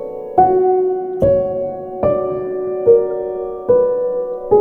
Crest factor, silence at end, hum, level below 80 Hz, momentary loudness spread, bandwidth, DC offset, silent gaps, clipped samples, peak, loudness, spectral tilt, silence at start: 16 dB; 0 s; none; -44 dBFS; 9 LU; 3.1 kHz; under 0.1%; none; under 0.1%; 0 dBFS; -16 LUFS; -11 dB/octave; 0 s